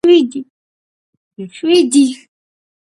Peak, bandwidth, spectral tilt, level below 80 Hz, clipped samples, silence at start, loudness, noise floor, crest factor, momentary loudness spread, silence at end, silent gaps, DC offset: 0 dBFS; 11.5 kHz; -3.5 dB/octave; -66 dBFS; under 0.1%; 0.05 s; -13 LUFS; under -90 dBFS; 16 dB; 21 LU; 0.7 s; 0.50-1.31 s; under 0.1%